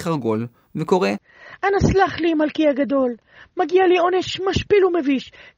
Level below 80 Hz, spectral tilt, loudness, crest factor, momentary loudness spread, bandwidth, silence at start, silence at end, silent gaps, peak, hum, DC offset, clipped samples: -42 dBFS; -6 dB/octave; -19 LUFS; 16 dB; 10 LU; 9.2 kHz; 0 s; 0.3 s; none; -4 dBFS; none; under 0.1%; under 0.1%